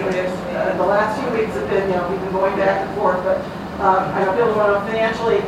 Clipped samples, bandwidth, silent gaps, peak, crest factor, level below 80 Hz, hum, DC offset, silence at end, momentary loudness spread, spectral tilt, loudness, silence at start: under 0.1%; 15 kHz; none; -2 dBFS; 16 dB; -44 dBFS; none; under 0.1%; 0 s; 5 LU; -6.5 dB/octave; -19 LUFS; 0 s